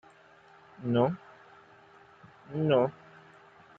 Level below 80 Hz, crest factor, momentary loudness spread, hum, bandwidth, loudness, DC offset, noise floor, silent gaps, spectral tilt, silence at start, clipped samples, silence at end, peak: -72 dBFS; 20 dB; 16 LU; none; 7 kHz; -30 LUFS; under 0.1%; -58 dBFS; none; -9 dB/octave; 0.8 s; under 0.1%; 0.85 s; -12 dBFS